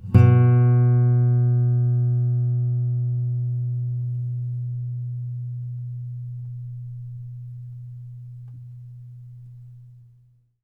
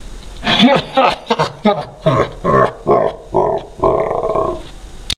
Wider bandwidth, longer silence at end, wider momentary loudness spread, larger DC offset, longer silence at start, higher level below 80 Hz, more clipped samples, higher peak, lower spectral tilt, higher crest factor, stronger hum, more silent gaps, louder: second, 2.9 kHz vs 14 kHz; first, 0.7 s vs 0.05 s; first, 24 LU vs 9 LU; neither; about the same, 0 s vs 0 s; second, -50 dBFS vs -34 dBFS; neither; about the same, -2 dBFS vs 0 dBFS; first, -11.5 dB/octave vs -5.5 dB/octave; about the same, 20 dB vs 16 dB; neither; neither; second, -22 LUFS vs -15 LUFS